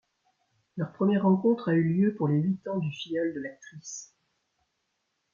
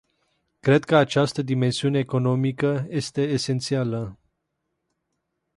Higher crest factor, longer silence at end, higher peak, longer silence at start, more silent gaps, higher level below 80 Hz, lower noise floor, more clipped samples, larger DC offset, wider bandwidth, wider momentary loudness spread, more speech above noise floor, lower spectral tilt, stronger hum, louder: about the same, 16 dB vs 20 dB; about the same, 1.3 s vs 1.4 s; second, -12 dBFS vs -4 dBFS; about the same, 0.75 s vs 0.65 s; neither; second, -72 dBFS vs -60 dBFS; about the same, -79 dBFS vs -78 dBFS; neither; neither; second, 7.4 kHz vs 11.5 kHz; first, 17 LU vs 9 LU; second, 52 dB vs 56 dB; about the same, -7 dB/octave vs -6 dB/octave; neither; second, -27 LUFS vs -23 LUFS